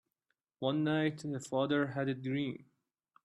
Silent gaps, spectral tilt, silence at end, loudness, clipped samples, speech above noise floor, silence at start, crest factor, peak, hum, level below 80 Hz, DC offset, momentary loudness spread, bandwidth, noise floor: none; -6.5 dB/octave; 0.6 s; -35 LUFS; under 0.1%; 51 dB; 0.6 s; 16 dB; -20 dBFS; none; -76 dBFS; under 0.1%; 8 LU; 11.5 kHz; -85 dBFS